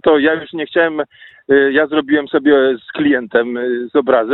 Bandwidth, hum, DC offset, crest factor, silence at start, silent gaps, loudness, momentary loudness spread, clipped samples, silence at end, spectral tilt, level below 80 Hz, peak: 4.1 kHz; none; under 0.1%; 14 dB; 0.05 s; none; -15 LUFS; 7 LU; under 0.1%; 0 s; -9 dB/octave; -56 dBFS; 0 dBFS